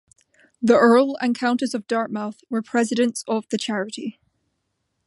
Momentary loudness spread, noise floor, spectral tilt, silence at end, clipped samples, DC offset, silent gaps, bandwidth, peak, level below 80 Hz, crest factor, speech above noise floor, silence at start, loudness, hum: 13 LU; -75 dBFS; -4.5 dB/octave; 0.95 s; under 0.1%; under 0.1%; none; 11.5 kHz; -2 dBFS; -70 dBFS; 20 dB; 54 dB; 0.6 s; -21 LUFS; none